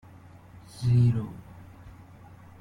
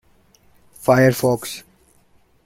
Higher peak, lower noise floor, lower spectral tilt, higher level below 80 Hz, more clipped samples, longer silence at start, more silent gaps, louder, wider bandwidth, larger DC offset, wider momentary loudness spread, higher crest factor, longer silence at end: second, -12 dBFS vs -2 dBFS; second, -50 dBFS vs -56 dBFS; first, -8.5 dB/octave vs -6 dB/octave; about the same, -54 dBFS vs -54 dBFS; neither; about the same, 0.75 s vs 0.8 s; neither; second, -25 LUFS vs -18 LUFS; second, 10.5 kHz vs 16.5 kHz; neither; first, 26 LU vs 17 LU; about the same, 16 dB vs 20 dB; second, 0.7 s vs 0.85 s